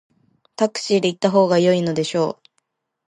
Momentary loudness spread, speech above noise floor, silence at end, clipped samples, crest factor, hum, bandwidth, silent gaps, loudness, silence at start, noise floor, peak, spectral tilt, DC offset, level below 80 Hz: 9 LU; 53 dB; 0.75 s; under 0.1%; 18 dB; none; 11 kHz; none; -19 LUFS; 0.6 s; -71 dBFS; -2 dBFS; -5.5 dB/octave; under 0.1%; -68 dBFS